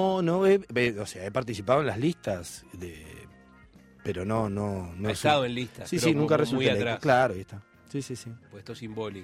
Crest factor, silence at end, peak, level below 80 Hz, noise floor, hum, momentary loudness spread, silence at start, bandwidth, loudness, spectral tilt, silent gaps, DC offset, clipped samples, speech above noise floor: 20 dB; 0 s; -8 dBFS; -58 dBFS; -54 dBFS; none; 18 LU; 0 s; 16 kHz; -27 LUFS; -5.5 dB/octave; none; under 0.1%; under 0.1%; 27 dB